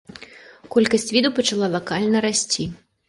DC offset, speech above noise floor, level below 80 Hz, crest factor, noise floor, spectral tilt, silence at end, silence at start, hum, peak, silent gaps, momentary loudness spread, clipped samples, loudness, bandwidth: under 0.1%; 24 dB; -56 dBFS; 18 dB; -44 dBFS; -3.5 dB/octave; 0.3 s; 0.2 s; none; -2 dBFS; none; 10 LU; under 0.1%; -20 LUFS; 11.5 kHz